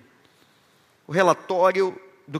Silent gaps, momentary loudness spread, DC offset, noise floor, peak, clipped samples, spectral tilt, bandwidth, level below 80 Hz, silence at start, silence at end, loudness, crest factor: none; 7 LU; under 0.1%; -60 dBFS; -4 dBFS; under 0.1%; -5.5 dB/octave; 14 kHz; -78 dBFS; 1.1 s; 0 s; -22 LUFS; 22 dB